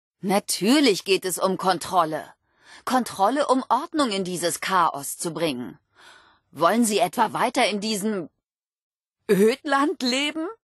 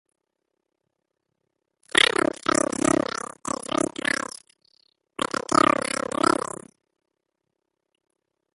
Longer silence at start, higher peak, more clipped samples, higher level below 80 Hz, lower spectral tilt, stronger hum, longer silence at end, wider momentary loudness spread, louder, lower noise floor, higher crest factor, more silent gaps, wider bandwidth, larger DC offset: second, 0.25 s vs 1.95 s; second, -6 dBFS vs -2 dBFS; neither; second, -70 dBFS vs -60 dBFS; about the same, -3.5 dB/octave vs -2.5 dB/octave; neither; second, 0.1 s vs 2.2 s; second, 9 LU vs 14 LU; about the same, -23 LUFS vs -23 LUFS; second, -53 dBFS vs -80 dBFS; second, 18 dB vs 26 dB; first, 8.54-8.59 s, 8.81-8.98 s vs none; about the same, 12.5 kHz vs 12 kHz; neither